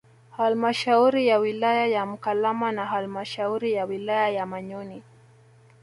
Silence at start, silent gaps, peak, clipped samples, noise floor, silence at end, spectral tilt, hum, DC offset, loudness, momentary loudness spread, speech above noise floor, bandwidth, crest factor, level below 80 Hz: 0.35 s; none; -8 dBFS; under 0.1%; -54 dBFS; 0.8 s; -5.5 dB/octave; none; under 0.1%; -24 LUFS; 13 LU; 30 dB; 11.5 kHz; 16 dB; -72 dBFS